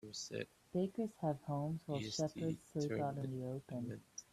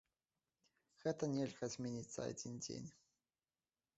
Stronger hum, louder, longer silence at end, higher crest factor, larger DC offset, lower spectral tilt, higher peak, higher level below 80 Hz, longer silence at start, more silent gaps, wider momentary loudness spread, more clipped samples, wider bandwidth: neither; first, -42 LUFS vs -45 LUFS; second, 0.1 s vs 1.05 s; second, 14 dB vs 22 dB; neither; about the same, -6 dB/octave vs -6 dB/octave; about the same, -28 dBFS vs -26 dBFS; about the same, -74 dBFS vs -78 dBFS; second, 0.05 s vs 1 s; neither; about the same, 6 LU vs 8 LU; neither; first, 14 kHz vs 8 kHz